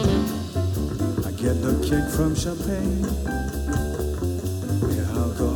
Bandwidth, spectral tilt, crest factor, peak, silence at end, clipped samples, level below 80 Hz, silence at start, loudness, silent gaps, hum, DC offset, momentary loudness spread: over 20 kHz; -6.5 dB/octave; 16 dB; -8 dBFS; 0 s; under 0.1%; -32 dBFS; 0 s; -25 LUFS; none; none; under 0.1%; 5 LU